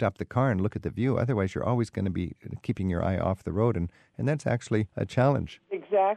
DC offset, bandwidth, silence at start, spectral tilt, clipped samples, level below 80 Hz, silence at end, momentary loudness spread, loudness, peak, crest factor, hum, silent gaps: under 0.1%; 9.8 kHz; 0 s; -8 dB/octave; under 0.1%; -50 dBFS; 0 s; 9 LU; -28 LUFS; -10 dBFS; 16 dB; none; none